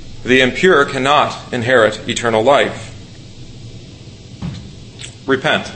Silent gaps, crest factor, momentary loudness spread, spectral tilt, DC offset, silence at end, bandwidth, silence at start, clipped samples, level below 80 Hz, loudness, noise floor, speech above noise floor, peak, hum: none; 16 dB; 23 LU; -4.5 dB/octave; under 0.1%; 0 s; 8.8 kHz; 0 s; under 0.1%; -40 dBFS; -14 LUFS; -35 dBFS; 22 dB; 0 dBFS; none